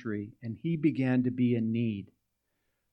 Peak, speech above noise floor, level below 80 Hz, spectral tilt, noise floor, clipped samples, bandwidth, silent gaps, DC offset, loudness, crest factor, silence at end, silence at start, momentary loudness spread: -14 dBFS; 50 dB; -72 dBFS; -10 dB/octave; -80 dBFS; under 0.1%; 5.4 kHz; none; under 0.1%; -30 LUFS; 16 dB; 0.85 s; 0 s; 10 LU